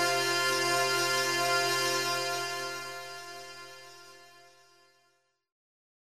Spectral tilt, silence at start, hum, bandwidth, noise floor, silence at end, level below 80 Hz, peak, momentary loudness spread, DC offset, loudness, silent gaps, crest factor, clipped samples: -1.5 dB/octave; 0 s; none; 15.5 kHz; -73 dBFS; 1.6 s; -74 dBFS; -16 dBFS; 19 LU; 0.2%; -28 LUFS; none; 16 dB; under 0.1%